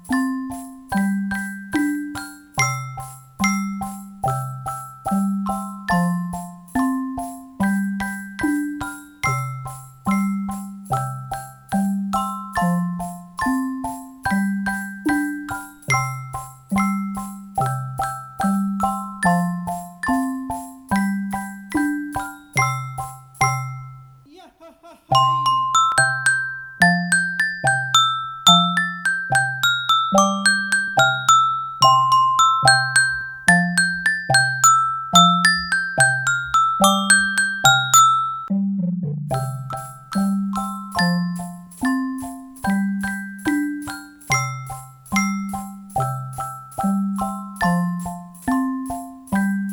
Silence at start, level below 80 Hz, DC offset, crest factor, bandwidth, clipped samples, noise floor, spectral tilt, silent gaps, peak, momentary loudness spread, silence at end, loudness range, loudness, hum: 0.05 s; -50 dBFS; under 0.1%; 20 dB; over 20 kHz; under 0.1%; -47 dBFS; -3.5 dB/octave; none; 0 dBFS; 16 LU; 0 s; 9 LU; -20 LUFS; none